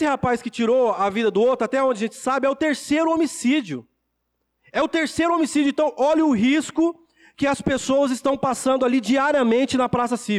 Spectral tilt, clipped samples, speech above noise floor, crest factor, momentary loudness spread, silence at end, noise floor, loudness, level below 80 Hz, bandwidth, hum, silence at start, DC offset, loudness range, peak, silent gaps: -4.5 dB/octave; under 0.1%; 54 dB; 8 dB; 5 LU; 0 s; -75 dBFS; -21 LUFS; -54 dBFS; 13.5 kHz; none; 0 s; under 0.1%; 2 LU; -12 dBFS; none